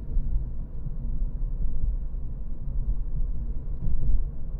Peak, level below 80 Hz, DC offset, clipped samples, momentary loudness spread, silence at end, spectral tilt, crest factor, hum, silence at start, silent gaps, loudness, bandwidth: -10 dBFS; -26 dBFS; under 0.1%; under 0.1%; 7 LU; 0 s; -12.5 dB/octave; 14 dB; none; 0 s; none; -34 LUFS; 1.1 kHz